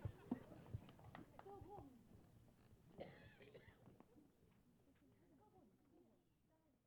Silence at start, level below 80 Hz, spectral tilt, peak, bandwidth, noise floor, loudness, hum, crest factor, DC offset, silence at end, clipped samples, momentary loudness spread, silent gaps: 0 s; -74 dBFS; -8 dB/octave; -32 dBFS; 19.5 kHz; -80 dBFS; -59 LUFS; none; 28 dB; under 0.1%; 0.05 s; under 0.1%; 16 LU; none